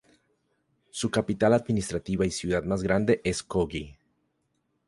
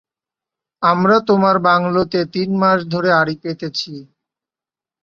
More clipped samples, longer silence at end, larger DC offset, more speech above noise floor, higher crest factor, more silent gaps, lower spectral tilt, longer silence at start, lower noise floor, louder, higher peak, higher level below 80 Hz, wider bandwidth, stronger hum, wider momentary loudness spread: neither; about the same, 0.95 s vs 1 s; neither; second, 49 dB vs 74 dB; about the same, 20 dB vs 16 dB; neither; about the same, -5.5 dB/octave vs -6.5 dB/octave; first, 0.95 s vs 0.8 s; second, -75 dBFS vs -90 dBFS; second, -27 LUFS vs -16 LUFS; second, -8 dBFS vs -2 dBFS; first, -48 dBFS vs -56 dBFS; first, 11.5 kHz vs 6.8 kHz; neither; about the same, 9 LU vs 11 LU